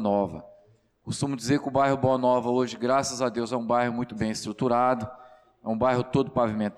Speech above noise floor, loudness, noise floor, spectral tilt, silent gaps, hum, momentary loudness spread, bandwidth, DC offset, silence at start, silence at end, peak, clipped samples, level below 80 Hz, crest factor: 35 dB; -26 LUFS; -60 dBFS; -5.5 dB/octave; none; none; 9 LU; 13.5 kHz; under 0.1%; 0 s; 0.05 s; -12 dBFS; under 0.1%; -58 dBFS; 14 dB